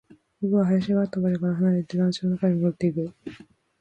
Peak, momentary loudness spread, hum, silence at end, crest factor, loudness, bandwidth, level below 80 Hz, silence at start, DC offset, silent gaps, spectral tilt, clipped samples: -10 dBFS; 10 LU; none; 0.45 s; 14 dB; -24 LUFS; 8.6 kHz; -62 dBFS; 0.4 s; under 0.1%; none; -8.5 dB/octave; under 0.1%